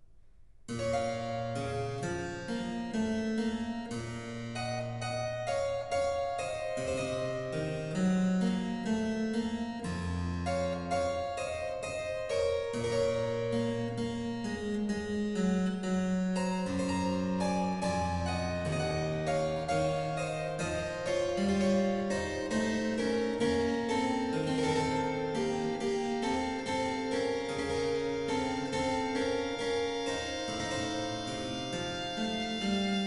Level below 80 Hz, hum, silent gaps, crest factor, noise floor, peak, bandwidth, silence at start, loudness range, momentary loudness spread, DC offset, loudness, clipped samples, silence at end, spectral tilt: -54 dBFS; none; none; 14 dB; -55 dBFS; -18 dBFS; 11.5 kHz; 0 s; 4 LU; 6 LU; under 0.1%; -33 LUFS; under 0.1%; 0 s; -5.5 dB/octave